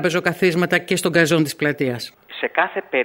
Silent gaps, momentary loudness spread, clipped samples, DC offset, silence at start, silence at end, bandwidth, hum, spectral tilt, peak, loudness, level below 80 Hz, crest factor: none; 9 LU; under 0.1%; under 0.1%; 0 s; 0 s; 16.5 kHz; none; -5 dB/octave; -2 dBFS; -19 LUFS; -60 dBFS; 18 dB